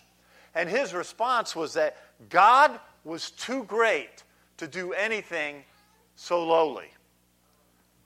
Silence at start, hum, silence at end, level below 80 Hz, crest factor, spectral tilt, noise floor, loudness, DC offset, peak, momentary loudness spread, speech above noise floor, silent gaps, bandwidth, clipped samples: 0.55 s; 60 Hz at -65 dBFS; 1.2 s; -74 dBFS; 20 dB; -3 dB/octave; -65 dBFS; -25 LUFS; under 0.1%; -6 dBFS; 18 LU; 39 dB; none; 16 kHz; under 0.1%